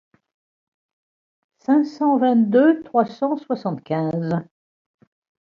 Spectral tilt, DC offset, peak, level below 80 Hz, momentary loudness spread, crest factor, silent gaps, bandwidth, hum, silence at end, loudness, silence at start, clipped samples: -9 dB/octave; under 0.1%; -4 dBFS; -68 dBFS; 10 LU; 18 dB; none; 7 kHz; none; 1 s; -20 LUFS; 1.7 s; under 0.1%